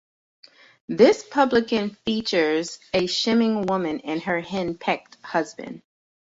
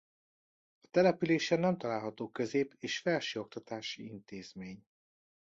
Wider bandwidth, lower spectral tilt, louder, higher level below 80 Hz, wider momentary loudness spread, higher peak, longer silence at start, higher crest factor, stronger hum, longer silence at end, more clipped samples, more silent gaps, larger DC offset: about the same, 8 kHz vs 7.8 kHz; about the same, -4.5 dB/octave vs -5.5 dB/octave; first, -23 LUFS vs -33 LUFS; first, -60 dBFS vs -74 dBFS; second, 11 LU vs 18 LU; first, -4 dBFS vs -16 dBFS; about the same, 0.9 s vs 0.95 s; about the same, 20 dB vs 20 dB; neither; second, 0.6 s vs 0.8 s; neither; neither; neither